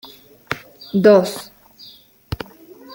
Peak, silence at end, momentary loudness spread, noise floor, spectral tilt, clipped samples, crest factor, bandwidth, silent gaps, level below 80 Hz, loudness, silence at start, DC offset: -2 dBFS; 0.6 s; 21 LU; -46 dBFS; -6 dB/octave; under 0.1%; 18 dB; 17 kHz; none; -48 dBFS; -17 LUFS; 0.5 s; under 0.1%